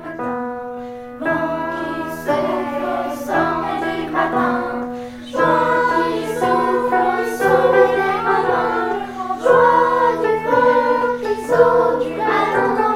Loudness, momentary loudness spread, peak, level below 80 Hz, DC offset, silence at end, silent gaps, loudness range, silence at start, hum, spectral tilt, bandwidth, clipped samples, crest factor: -17 LUFS; 11 LU; 0 dBFS; -50 dBFS; under 0.1%; 0 s; none; 6 LU; 0 s; none; -5.5 dB/octave; 15.5 kHz; under 0.1%; 16 dB